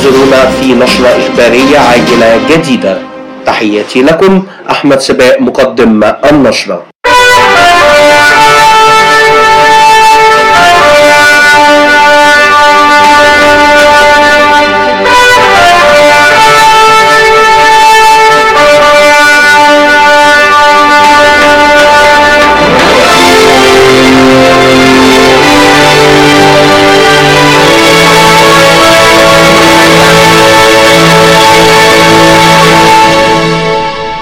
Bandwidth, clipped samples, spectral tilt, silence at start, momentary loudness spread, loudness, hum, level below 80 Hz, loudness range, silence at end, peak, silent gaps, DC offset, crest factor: over 20 kHz; 6%; -3.5 dB/octave; 0 s; 5 LU; -2 LUFS; none; -30 dBFS; 4 LU; 0 s; 0 dBFS; 6.95-6.99 s; under 0.1%; 2 dB